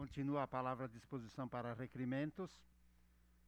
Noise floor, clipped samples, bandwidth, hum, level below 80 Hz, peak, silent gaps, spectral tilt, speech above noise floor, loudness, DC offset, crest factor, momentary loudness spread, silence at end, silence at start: -71 dBFS; under 0.1%; 10.5 kHz; 60 Hz at -70 dBFS; -70 dBFS; -28 dBFS; none; -8 dB/octave; 26 dB; -45 LUFS; under 0.1%; 18 dB; 10 LU; 0.8 s; 0 s